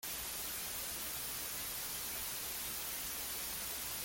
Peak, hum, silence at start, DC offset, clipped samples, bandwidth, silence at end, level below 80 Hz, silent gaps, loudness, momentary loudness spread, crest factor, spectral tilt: -28 dBFS; none; 0.05 s; under 0.1%; under 0.1%; 17 kHz; 0 s; -62 dBFS; none; -39 LUFS; 0 LU; 14 dB; 0 dB/octave